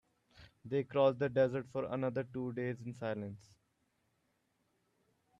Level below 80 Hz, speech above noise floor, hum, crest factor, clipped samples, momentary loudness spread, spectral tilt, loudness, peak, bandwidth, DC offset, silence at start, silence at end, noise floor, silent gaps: -74 dBFS; 44 dB; none; 20 dB; under 0.1%; 12 LU; -8 dB/octave; -36 LUFS; -18 dBFS; 7.8 kHz; under 0.1%; 0.4 s; 2 s; -79 dBFS; none